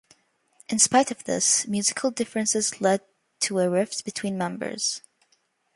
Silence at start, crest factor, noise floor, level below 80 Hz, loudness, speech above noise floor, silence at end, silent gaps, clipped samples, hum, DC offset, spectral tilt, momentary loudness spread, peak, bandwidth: 0.7 s; 22 dB; -69 dBFS; -70 dBFS; -24 LUFS; 44 dB; 0.75 s; none; under 0.1%; none; under 0.1%; -2.5 dB/octave; 10 LU; -4 dBFS; 11.5 kHz